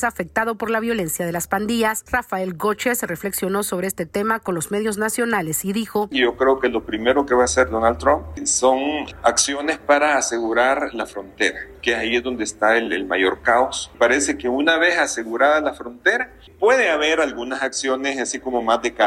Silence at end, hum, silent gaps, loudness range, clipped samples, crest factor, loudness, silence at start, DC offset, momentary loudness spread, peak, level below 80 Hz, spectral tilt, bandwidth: 0 s; none; none; 4 LU; under 0.1%; 16 dB; -20 LUFS; 0 s; under 0.1%; 7 LU; -4 dBFS; -46 dBFS; -3 dB/octave; 16 kHz